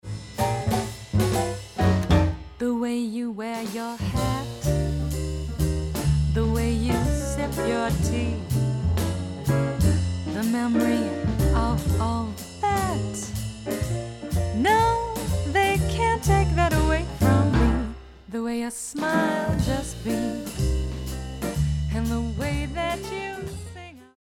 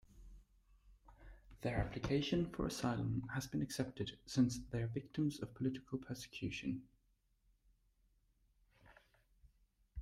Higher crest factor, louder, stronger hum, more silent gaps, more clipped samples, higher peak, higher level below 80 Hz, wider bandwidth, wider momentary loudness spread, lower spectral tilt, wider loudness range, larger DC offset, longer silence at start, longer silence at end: about the same, 18 dB vs 20 dB; first, -25 LUFS vs -41 LUFS; neither; neither; neither; first, -6 dBFS vs -24 dBFS; first, -32 dBFS vs -60 dBFS; first, 17.5 kHz vs 15.5 kHz; about the same, 9 LU vs 9 LU; about the same, -6 dB/octave vs -6 dB/octave; second, 5 LU vs 11 LU; neither; about the same, 0.05 s vs 0.1 s; first, 0.25 s vs 0 s